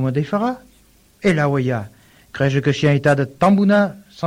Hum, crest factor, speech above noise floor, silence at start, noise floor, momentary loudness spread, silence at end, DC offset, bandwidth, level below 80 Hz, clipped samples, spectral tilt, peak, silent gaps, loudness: none; 14 dB; 36 dB; 0 s; -53 dBFS; 11 LU; 0 s; under 0.1%; 11.5 kHz; -50 dBFS; under 0.1%; -7.5 dB/octave; -4 dBFS; none; -18 LUFS